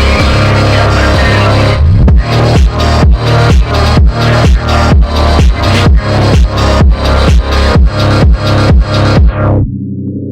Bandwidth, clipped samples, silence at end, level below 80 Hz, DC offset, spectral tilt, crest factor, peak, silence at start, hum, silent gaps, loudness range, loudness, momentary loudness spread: 10.5 kHz; under 0.1%; 0 s; -10 dBFS; under 0.1%; -6.5 dB/octave; 6 dB; 0 dBFS; 0 s; none; none; 1 LU; -8 LUFS; 2 LU